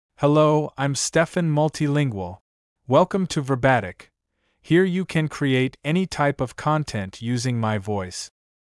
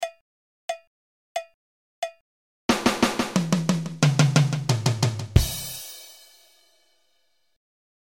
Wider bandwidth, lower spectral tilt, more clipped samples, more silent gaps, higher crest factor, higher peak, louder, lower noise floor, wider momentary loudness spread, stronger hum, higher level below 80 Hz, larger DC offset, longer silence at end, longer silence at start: second, 12 kHz vs 17 kHz; about the same, -5.5 dB/octave vs -5 dB/octave; neither; second, 2.41-2.76 s vs 0.21-0.68 s, 0.87-1.35 s, 1.54-2.02 s, 2.21-2.69 s; about the same, 18 dB vs 22 dB; about the same, -4 dBFS vs -4 dBFS; about the same, -22 LUFS vs -24 LUFS; about the same, -72 dBFS vs -72 dBFS; second, 10 LU vs 15 LU; neither; second, -54 dBFS vs -40 dBFS; neither; second, 0.35 s vs 1.9 s; first, 0.2 s vs 0 s